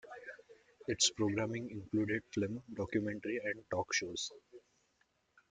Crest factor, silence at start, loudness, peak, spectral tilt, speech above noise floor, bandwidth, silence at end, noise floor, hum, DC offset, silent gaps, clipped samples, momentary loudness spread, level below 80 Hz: 22 dB; 0.05 s; -37 LUFS; -16 dBFS; -3.5 dB/octave; 40 dB; 9.6 kHz; 0.9 s; -77 dBFS; none; under 0.1%; none; under 0.1%; 16 LU; -70 dBFS